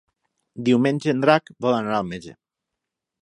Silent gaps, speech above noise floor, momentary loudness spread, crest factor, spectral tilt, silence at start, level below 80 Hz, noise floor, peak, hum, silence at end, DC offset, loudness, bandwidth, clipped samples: none; 63 dB; 9 LU; 22 dB; -6.5 dB/octave; 0.55 s; -62 dBFS; -84 dBFS; -2 dBFS; none; 0.9 s; under 0.1%; -21 LUFS; 11 kHz; under 0.1%